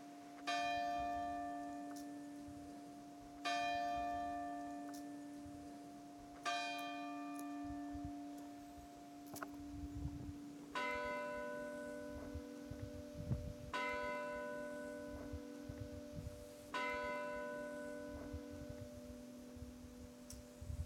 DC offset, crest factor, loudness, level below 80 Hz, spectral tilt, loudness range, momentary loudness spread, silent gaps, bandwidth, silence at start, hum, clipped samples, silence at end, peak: under 0.1%; 18 dB; -47 LUFS; -60 dBFS; -5 dB/octave; 4 LU; 13 LU; none; 16 kHz; 0 s; none; under 0.1%; 0 s; -28 dBFS